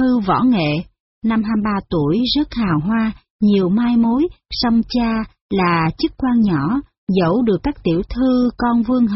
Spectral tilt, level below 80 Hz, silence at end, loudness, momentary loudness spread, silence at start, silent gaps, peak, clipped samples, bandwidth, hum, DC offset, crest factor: -5.5 dB/octave; -38 dBFS; 0 s; -18 LUFS; 5 LU; 0 s; 1.00-1.22 s, 3.30-3.39 s, 5.41-5.49 s, 6.98-7.07 s; -6 dBFS; under 0.1%; 6 kHz; none; under 0.1%; 12 dB